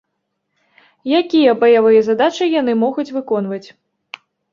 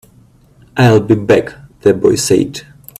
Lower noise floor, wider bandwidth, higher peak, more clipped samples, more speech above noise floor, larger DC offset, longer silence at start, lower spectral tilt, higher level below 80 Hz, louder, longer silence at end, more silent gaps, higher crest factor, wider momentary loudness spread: first, -73 dBFS vs -46 dBFS; second, 7.2 kHz vs 14.5 kHz; about the same, -2 dBFS vs 0 dBFS; neither; first, 59 dB vs 35 dB; neither; first, 1.05 s vs 0.75 s; about the same, -5.5 dB/octave vs -5.5 dB/octave; second, -64 dBFS vs -46 dBFS; second, -15 LUFS vs -12 LUFS; first, 0.9 s vs 0.4 s; neither; about the same, 14 dB vs 14 dB; first, 23 LU vs 14 LU